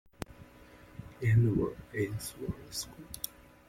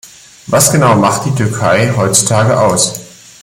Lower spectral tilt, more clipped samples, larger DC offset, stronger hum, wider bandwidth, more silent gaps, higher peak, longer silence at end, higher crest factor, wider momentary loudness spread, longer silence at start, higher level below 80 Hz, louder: first, -6 dB/octave vs -4 dB/octave; neither; neither; neither; second, 16.5 kHz vs over 20 kHz; neither; second, -14 dBFS vs 0 dBFS; about the same, 0.4 s vs 0.35 s; first, 20 dB vs 12 dB; first, 23 LU vs 7 LU; first, 0.2 s vs 0.05 s; second, -54 dBFS vs -46 dBFS; second, -33 LUFS vs -10 LUFS